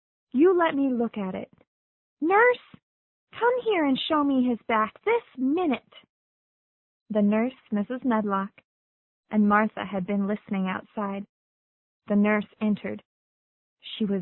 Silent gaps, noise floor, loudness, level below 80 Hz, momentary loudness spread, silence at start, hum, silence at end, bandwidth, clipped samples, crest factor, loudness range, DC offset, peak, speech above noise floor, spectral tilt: 1.67-2.17 s, 2.83-3.27 s, 6.09-7.06 s, 8.65-9.23 s, 11.29-12.00 s, 13.05-13.77 s; under -90 dBFS; -25 LUFS; -66 dBFS; 12 LU; 0.35 s; none; 0 s; 4.2 kHz; under 0.1%; 18 dB; 4 LU; under 0.1%; -8 dBFS; over 65 dB; -10.5 dB/octave